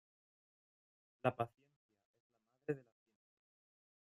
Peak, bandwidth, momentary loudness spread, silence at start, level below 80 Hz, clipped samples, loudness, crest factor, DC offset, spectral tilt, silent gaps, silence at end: -20 dBFS; 12 kHz; 7 LU; 1.25 s; -84 dBFS; under 0.1%; -44 LUFS; 28 dB; under 0.1%; -8 dB/octave; 1.76-1.89 s, 2.05-2.14 s, 2.20-2.30 s; 1.35 s